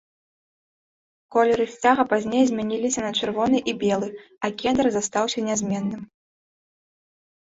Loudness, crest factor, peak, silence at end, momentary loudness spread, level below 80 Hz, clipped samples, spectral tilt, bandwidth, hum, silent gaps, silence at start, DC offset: -23 LUFS; 18 dB; -6 dBFS; 1.4 s; 8 LU; -60 dBFS; under 0.1%; -4 dB/octave; 8 kHz; none; none; 1.3 s; under 0.1%